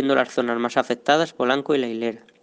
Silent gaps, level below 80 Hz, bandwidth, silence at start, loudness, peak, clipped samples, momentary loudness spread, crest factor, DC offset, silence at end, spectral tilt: none; -72 dBFS; 9.6 kHz; 0 s; -22 LUFS; -2 dBFS; under 0.1%; 6 LU; 20 dB; under 0.1%; 0.25 s; -4.5 dB/octave